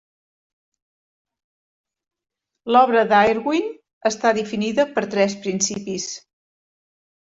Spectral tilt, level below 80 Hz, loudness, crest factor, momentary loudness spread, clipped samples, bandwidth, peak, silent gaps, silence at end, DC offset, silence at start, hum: -3.5 dB/octave; -62 dBFS; -20 LUFS; 20 dB; 13 LU; under 0.1%; 8.2 kHz; -4 dBFS; 3.93-4.01 s; 1.05 s; under 0.1%; 2.65 s; none